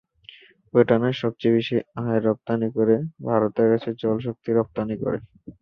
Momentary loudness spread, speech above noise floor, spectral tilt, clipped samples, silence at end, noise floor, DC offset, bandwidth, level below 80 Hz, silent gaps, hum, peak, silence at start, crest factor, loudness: 7 LU; 27 dB; -9 dB/octave; under 0.1%; 0.1 s; -49 dBFS; under 0.1%; 6.2 kHz; -58 dBFS; none; none; -4 dBFS; 0.75 s; 20 dB; -23 LUFS